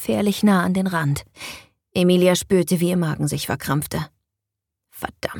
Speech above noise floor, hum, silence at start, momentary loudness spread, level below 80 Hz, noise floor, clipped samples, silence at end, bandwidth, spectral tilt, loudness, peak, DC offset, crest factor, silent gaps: 63 dB; none; 0 s; 17 LU; -50 dBFS; -83 dBFS; under 0.1%; 0 s; 19 kHz; -5.5 dB/octave; -20 LUFS; -4 dBFS; under 0.1%; 16 dB; none